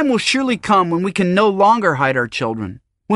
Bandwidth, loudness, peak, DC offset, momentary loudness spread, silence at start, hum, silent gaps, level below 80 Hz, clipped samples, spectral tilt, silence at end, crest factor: 11.5 kHz; -16 LUFS; 0 dBFS; under 0.1%; 9 LU; 0 s; none; none; -54 dBFS; under 0.1%; -5 dB/octave; 0 s; 16 dB